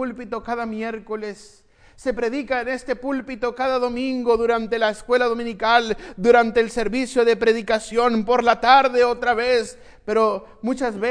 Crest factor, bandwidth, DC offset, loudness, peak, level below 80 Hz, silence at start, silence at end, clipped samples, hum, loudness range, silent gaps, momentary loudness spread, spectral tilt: 18 dB; 10.5 kHz; under 0.1%; -20 LUFS; -2 dBFS; -48 dBFS; 0 s; 0 s; under 0.1%; none; 8 LU; none; 12 LU; -4 dB/octave